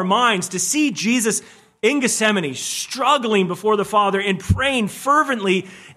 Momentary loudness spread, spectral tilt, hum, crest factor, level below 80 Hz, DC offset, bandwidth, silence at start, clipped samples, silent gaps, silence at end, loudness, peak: 5 LU; -3.5 dB/octave; none; 16 dB; -42 dBFS; under 0.1%; 15 kHz; 0 s; under 0.1%; none; 0.05 s; -19 LUFS; -2 dBFS